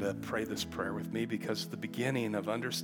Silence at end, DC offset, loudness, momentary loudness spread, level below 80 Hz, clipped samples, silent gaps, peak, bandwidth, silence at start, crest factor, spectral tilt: 0 s; under 0.1%; -36 LUFS; 4 LU; -68 dBFS; under 0.1%; none; -18 dBFS; 18 kHz; 0 s; 16 dB; -5 dB/octave